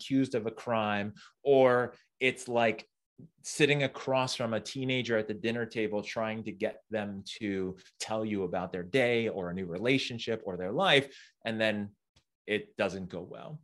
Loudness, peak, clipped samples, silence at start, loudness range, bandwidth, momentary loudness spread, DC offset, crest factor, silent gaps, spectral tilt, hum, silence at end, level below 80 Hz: -31 LUFS; -10 dBFS; under 0.1%; 0 s; 5 LU; 12.5 kHz; 14 LU; under 0.1%; 22 dB; 3.06-3.16 s, 12.09-12.14 s, 12.35-12.45 s; -5 dB/octave; none; 0.05 s; -72 dBFS